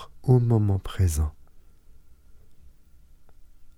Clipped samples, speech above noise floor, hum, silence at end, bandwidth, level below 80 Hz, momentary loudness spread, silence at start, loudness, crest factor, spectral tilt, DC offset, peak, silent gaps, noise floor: under 0.1%; 29 dB; none; 0.1 s; 15.5 kHz; -38 dBFS; 9 LU; 0 s; -24 LUFS; 20 dB; -7.5 dB/octave; under 0.1%; -8 dBFS; none; -51 dBFS